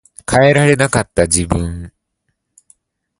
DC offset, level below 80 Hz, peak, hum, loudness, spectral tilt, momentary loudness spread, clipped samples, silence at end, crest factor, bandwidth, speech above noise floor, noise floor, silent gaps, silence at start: under 0.1%; -32 dBFS; 0 dBFS; none; -13 LUFS; -4.5 dB/octave; 11 LU; under 0.1%; 1.3 s; 16 dB; 11.5 kHz; 57 dB; -70 dBFS; none; 0.3 s